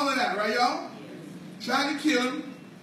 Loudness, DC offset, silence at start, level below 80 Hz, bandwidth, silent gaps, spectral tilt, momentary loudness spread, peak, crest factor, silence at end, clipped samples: -27 LUFS; under 0.1%; 0 s; -78 dBFS; 15.5 kHz; none; -3 dB/octave; 17 LU; -12 dBFS; 16 dB; 0 s; under 0.1%